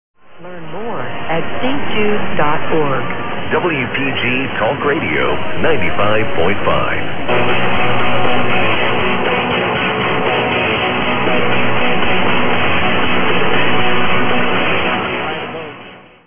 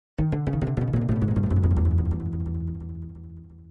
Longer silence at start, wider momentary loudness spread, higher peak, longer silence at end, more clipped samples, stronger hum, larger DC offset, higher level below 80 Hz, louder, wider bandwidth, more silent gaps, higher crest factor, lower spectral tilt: about the same, 0.15 s vs 0.2 s; second, 7 LU vs 17 LU; first, 0 dBFS vs -10 dBFS; about the same, 0 s vs 0 s; neither; neither; neither; about the same, -40 dBFS vs -36 dBFS; first, -16 LUFS vs -25 LUFS; about the same, 3.7 kHz vs 3.7 kHz; neither; about the same, 12 dB vs 14 dB; second, -8.5 dB/octave vs -10.5 dB/octave